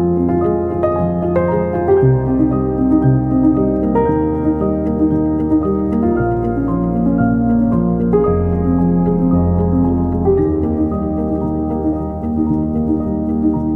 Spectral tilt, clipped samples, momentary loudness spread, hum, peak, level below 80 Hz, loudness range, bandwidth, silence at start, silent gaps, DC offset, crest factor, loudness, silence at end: -12.5 dB/octave; under 0.1%; 5 LU; none; -2 dBFS; -28 dBFS; 2 LU; 3.1 kHz; 0 s; none; under 0.1%; 14 dB; -16 LUFS; 0 s